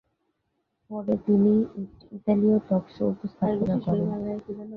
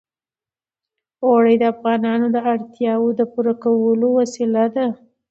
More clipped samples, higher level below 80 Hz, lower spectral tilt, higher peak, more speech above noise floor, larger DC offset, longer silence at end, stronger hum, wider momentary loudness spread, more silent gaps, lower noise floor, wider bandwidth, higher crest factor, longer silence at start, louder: neither; first, -58 dBFS vs -70 dBFS; first, -11.5 dB/octave vs -6.5 dB/octave; second, -10 dBFS vs -4 dBFS; second, 52 dB vs over 73 dB; neither; second, 0 s vs 0.35 s; neither; first, 13 LU vs 7 LU; neither; second, -77 dBFS vs under -90 dBFS; second, 4.5 kHz vs 7.8 kHz; about the same, 16 dB vs 16 dB; second, 0.9 s vs 1.2 s; second, -25 LUFS vs -18 LUFS